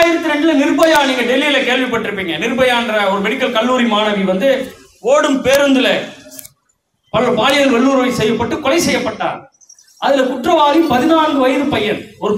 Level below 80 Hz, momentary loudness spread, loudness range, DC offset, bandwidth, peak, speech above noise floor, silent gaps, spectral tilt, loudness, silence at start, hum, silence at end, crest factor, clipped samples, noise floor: -48 dBFS; 9 LU; 2 LU; under 0.1%; 16 kHz; 0 dBFS; 50 dB; none; -4 dB/octave; -14 LUFS; 0 s; none; 0 s; 14 dB; under 0.1%; -64 dBFS